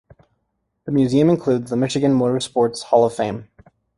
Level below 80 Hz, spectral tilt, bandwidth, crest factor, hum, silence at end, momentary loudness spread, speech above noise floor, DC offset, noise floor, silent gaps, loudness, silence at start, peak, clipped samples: -56 dBFS; -6.5 dB/octave; 11.5 kHz; 18 dB; none; 0.55 s; 9 LU; 55 dB; under 0.1%; -72 dBFS; none; -19 LUFS; 0.85 s; -2 dBFS; under 0.1%